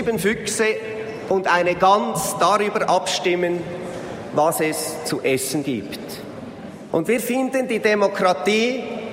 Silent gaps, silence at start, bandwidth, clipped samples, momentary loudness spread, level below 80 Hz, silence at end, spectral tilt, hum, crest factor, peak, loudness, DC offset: none; 0 s; 16 kHz; under 0.1%; 13 LU; -56 dBFS; 0 s; -4 dB/octave; none; 16 dB; -4 dBFS; -20 LUFS; under 0.1%